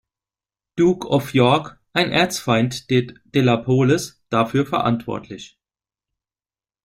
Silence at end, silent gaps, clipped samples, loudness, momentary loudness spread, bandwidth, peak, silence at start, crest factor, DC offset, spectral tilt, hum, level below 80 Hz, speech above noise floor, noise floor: 1.35 s; none; under 0.1%; -19 LUFS; 9 LU; 16 kHz; -2 dBFS; 0.75 s; 18 dB; under 0.1%; -5.5 dB/octave; none; -54 dBFS; over 71 dB; under -90 dBFS